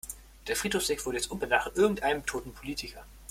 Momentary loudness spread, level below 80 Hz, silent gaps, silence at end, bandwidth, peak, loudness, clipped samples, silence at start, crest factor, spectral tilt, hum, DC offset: 16 LU; -50 dBFS; none; 0 s; 16.5 kHz; -10 dBFS; -30 LUFS; under 0.1%; 0.05 s; 22 dB; -3 dB/octave; none; under 0.1%